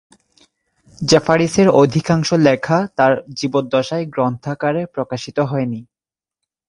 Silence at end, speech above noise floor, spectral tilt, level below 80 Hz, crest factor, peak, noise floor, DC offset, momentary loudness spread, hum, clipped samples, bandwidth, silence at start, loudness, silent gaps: 0.85 s; over 74 dB; -5.5 dB/octave; -52 dBFS; 18 dB; 0 dBFS; under -90 dBFS; under 0.1%; 10 LU; none; under 0.1%; 11.5 kHz; 1 s; -17 LUFS; none